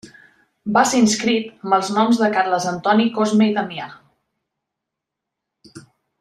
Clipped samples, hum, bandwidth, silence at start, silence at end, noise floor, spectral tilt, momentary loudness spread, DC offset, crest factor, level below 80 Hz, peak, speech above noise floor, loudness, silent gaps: under 0.1%; none; 13 kHz; 0.05 s; 0.4 s; -82 dBFS; -4 dB/octave; 10 LU; under 0.1%; 18 dB; -64 dBFS; -2 dBFS; 65 dB; -18 LUFS; none